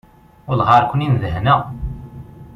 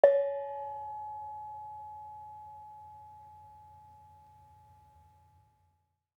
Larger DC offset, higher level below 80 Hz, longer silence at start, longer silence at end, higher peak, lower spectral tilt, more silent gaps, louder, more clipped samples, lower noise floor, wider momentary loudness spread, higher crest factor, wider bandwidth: neither; first, -36 dBFS vs -78 dBFS; first, 0.45 s vs 0.05 s; second, 0 s vs 2.1 s; first, 0 dBFS vs -6 dBFS; first, -8 dB/octave vs -6.5 dB/octave; neither; first, -16 LUFS vs -37 LUFS; neither; second, -36 dBFS vs -76 dBFS; about the same, 21 LU vs 22 LU; second, 18 dB vs 30 dB; first, 6.6 kHz vs 3.8 kHz